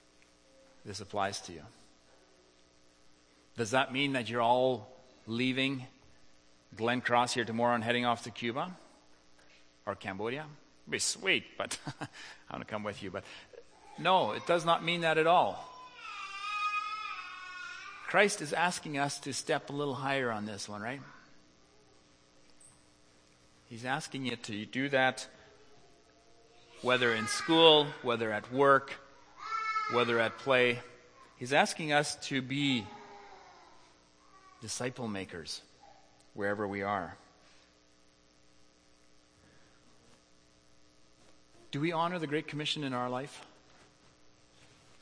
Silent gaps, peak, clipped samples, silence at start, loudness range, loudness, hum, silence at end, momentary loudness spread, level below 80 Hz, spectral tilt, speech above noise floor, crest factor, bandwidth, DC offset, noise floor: none; -8 dBFS; under 0.1%; 0.85 s; 12 LU; -32 LUFS; 60 Hz at -70 dBFS; 1.55 s; 18 LU; -74 dBFS; -3.5 dB/octave; 33 dB; 26 dB; 10.5 kHz; under 0.1%; -65 dBFS